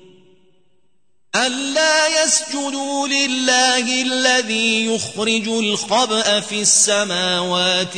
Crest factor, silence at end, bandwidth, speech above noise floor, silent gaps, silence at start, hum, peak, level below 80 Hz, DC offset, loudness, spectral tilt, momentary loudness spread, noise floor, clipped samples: 16 dB; 0 s; 9.6 kHz; 52 dB; none; 1.35 s; none; -2 dBFS; -68 dBFS; 0.2%; -16 LUFS; -1 dB/octave; 6 LU; -70 dBFS; under 0.1%